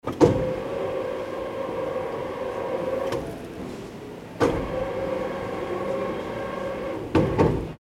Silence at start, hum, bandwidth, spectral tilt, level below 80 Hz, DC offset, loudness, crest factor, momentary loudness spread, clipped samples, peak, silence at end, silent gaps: 0.05 s; none; 16 kHz; -7 dB/octave; -44 dBFS; under 0.1%; -27 LUFS; 24 dB; 14 LU; under 0.1%; -2 dBFS; 0.05 s; none